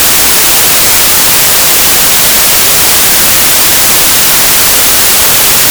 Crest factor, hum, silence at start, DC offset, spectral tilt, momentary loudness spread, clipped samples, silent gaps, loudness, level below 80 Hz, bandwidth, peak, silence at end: 6 dB; none; 0 s; under 0.1%; 0 dB/octave; 0 LU; 5%; none; -2 LUFS; -30 dBFS; over 20 kHz; 0 dBFS; 0 s